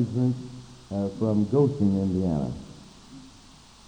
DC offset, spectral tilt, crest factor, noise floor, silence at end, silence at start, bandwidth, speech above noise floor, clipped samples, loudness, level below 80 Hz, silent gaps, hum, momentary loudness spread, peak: under 0.1%; -9 dB/octave; 16 dB; -51 dBFS; 0.6 s; 0 s; 9.8 kHz; 27 dB; under 0.1%; -26 LUFS; -52 dBFS; none; none; 24 LU; -10 dBFS